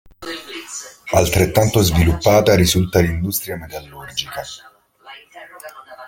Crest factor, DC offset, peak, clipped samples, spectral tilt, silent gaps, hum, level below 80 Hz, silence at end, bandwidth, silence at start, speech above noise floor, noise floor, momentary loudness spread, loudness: 18 dB; under 0.1%; 0 dBFS; under 0.1%; -5 dB/octave; none; none; -36 dBFS; 0 s; 17 kHz; 0.2 s; 26 dB; -43 dBFS; 23 LU; -16 LUFS